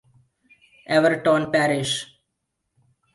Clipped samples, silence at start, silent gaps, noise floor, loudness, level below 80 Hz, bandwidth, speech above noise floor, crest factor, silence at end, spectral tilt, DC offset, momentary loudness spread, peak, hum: under 0.1%; 0.9 s; none; -78 dBFS; -21 LUFS; -64 dBFS; 11.5 kHz; 58 dB; 20 dB; 1.1 s; -4.5 dB/octave; under 0.1%; 9 LU; -4 dBFS; none